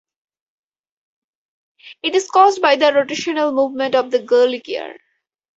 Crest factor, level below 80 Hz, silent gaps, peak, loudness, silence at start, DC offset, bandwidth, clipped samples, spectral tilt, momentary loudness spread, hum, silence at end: 18 dB; -68 dBFS; none; 0 dBFS; -16 LUFS; 1.85 s; under 0.1%; 8 kHz; under 0.1%; -2.5 dB/octave; 12 LU; none; 0.6 s